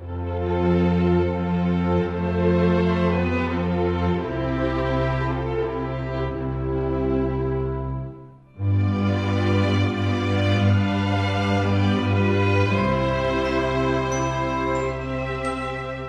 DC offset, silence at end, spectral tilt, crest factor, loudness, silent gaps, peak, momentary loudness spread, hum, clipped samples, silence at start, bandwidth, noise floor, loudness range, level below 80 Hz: under 0.1%; 0 s; -7.5 dB/octave; 14 dB; -23 LUFS; none; -8 dBFS; 7 LU; none; under 0.1%; 0 s; 9 kHz; -42 dBFS; 4 LU; -34 dBFS